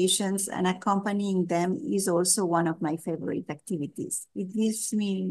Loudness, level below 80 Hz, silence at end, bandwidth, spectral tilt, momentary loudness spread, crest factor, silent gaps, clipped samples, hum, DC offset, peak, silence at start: -28 LUFS; -74 dBFS; 0 s; 12.5 kHz; -4 dB/octave; 10 LU; 18 dB; none; under 0.1%; none; under 0.1%; -10 dBFS; 0 s